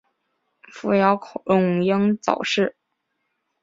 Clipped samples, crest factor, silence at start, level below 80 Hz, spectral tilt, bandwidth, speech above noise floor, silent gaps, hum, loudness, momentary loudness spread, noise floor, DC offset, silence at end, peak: under 0.1%; 20 dB; 0.75 s; -66 dBFS; -6 dB/octave; 7.8 kHz; 55 dB; none; none; -21 LUFS; 7 LU; -75 dBFS; under 0.1%; 0.9 s; -4 dBFS